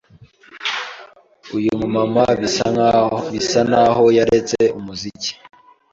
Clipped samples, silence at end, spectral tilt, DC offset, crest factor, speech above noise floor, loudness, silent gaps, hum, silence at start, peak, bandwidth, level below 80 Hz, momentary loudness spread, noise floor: under 0.1%; 0.6 s; -4.5 dB/octave; under 0.1%; 16 dB; 31 dB; -17 LUFS; none; none; 0.55 s; -2 dBFS; 7.8 kHz; -48 dBFS; 13 LU; -47 dBFS